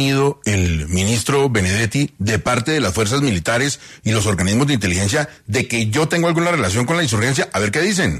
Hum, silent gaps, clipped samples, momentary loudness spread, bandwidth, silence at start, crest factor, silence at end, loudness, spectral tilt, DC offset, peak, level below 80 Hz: none; none; under 0.1%; 3 LU; 13.5 kHz; 0 s; 14 dB; 0 s; -17 LUFS; -4.5 dB/octave; under 0.1%; -4 dBFS; -38 dBFS